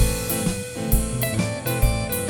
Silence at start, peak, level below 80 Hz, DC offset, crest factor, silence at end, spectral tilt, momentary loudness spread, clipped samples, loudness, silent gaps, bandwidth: 0 s; -6 dBFS; -28 dBFS; under 0.1%; 16 dB; 0 s; -4.5 dB/octave; 3 LU; under 0.1%; -23 LUFS; none; 19 kHz